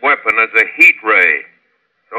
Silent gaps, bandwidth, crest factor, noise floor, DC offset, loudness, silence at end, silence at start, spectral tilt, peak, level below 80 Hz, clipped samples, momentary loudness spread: none; 17.5 kHz; 14 dB; -62 dBFS; under 0.1%; -10 LUFS; 0 s; 0 s; -2 dB/octave; 0 dBFS; -62 dBFS; 0.2%; 6 LU